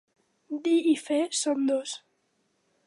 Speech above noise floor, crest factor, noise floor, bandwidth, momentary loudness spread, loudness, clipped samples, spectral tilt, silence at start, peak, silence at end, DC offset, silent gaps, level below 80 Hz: 47 dB; 16 dB; -73 dBFS; 11.5 kHz; 14 LU; -26 LUFS; under 0.1%; -2 dB/octave; 0.5 s; -14 dBFS; 0.9 s; under 0.1%; none; -86 dBFS